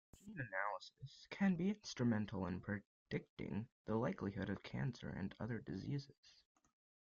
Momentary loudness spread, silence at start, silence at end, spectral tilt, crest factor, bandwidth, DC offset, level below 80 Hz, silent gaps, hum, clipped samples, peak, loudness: 11 LU; 0.25 s; 0.75 s; -6 dB/octave; 18 dB; 7.4 kHz; under 0.1%; -70 dBFS; 2.86-3.06 s, 3.29-3.37 s, 3.72-3.85 s, 6.18-6.23 s; none; under 0.1%; -26 dBFS; -44 LUFS